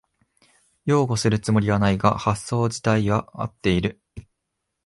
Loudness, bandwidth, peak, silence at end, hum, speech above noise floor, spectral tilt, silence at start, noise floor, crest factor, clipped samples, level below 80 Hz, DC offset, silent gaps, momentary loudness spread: -22 LUFS; 11.5 kHz; -2 dBFS; 0.65 s; none; 58 dB; -6 dB/octave; 0.85 s; -79 dBFS; 20 dB; under 0.1%; -44 dBFS; under 0.1%; none; 6 LU